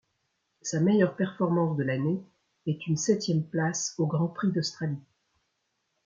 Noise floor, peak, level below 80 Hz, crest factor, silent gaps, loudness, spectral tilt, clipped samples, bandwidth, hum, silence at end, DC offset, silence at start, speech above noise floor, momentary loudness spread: -78 dBFS; -10 dBFS; -72 dBFS; 18 dB; none; -28 LUFS; -5.5 dB/octave; under 0.1%; 7.6 kHz; none; 1.05 s; under 0.1%; 0.65 s; 51 dB; 10 LU